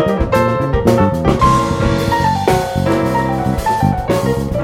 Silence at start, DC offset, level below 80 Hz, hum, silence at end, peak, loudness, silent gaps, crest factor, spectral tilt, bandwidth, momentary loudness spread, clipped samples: 0 s; under 0.1%; -26 dBFS; none; 0 s; 0 dBFS; -15 LUFS; none; 14 dB; -6.5 dB/octave; 17 kHz; 4 LU; under 0.1%